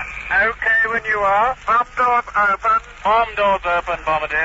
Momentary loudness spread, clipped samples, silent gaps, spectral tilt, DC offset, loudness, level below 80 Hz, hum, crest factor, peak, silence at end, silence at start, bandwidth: 4 LU; under 0.1%; none; -0.5 dB/octave; under 0.1%; -17 LUFS; -42 dBFS; none; 12 dB; -6 dBFS; 0 s; 0 s; 8 kHz